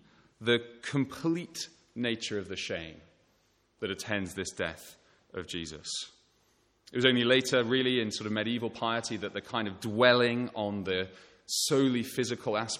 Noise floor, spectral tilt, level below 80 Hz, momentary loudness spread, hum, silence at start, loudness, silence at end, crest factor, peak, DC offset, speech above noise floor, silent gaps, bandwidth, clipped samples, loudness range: -70 dBFS; -4 dB/octave; -66 dBFS; 14 LU; none; 0.4 s; -30 LUFS; 0 s; 24 dB; -8 dBFS; under 0.1%; 40 dB; none; 16.5 kHz; under 0.1%; 9 LU